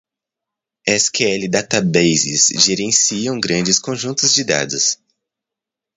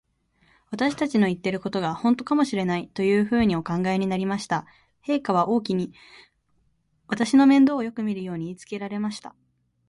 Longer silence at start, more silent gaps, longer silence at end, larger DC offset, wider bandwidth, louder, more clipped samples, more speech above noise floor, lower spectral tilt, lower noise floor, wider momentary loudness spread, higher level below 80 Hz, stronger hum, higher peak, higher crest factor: first, 0.85 s vs 0.7 s; neither; first, 1 s vs 0.6 s; neither; about the same, 11 kHz vs 11.5 kHz; first, -15 LUFS vs -24 LUFS; neither; first, 68 dB vs 44 dB; second, -2 dB/octave vs -6.5 dB/octave; first, -85 dBFS vs -67 dBFS; second, 6 LU vs 13 LU; about the same, -56 dBFS vs -58 dBFS; neither; first, 0 dBFS vs -8 dBFS; about the same, 18 dB vs 16 dB